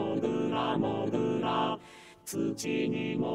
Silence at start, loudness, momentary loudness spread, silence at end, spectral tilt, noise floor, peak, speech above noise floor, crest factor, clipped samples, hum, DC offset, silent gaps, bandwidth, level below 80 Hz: 0 s; -31 LUFS; 9 LU; 0 s; -5.5 dB/octave; -52 dBFS; -16 dBFS; 21 dB; 16 dB; under 0.1%; none; under 0.1%; none; 16 kHz; -66 dBFS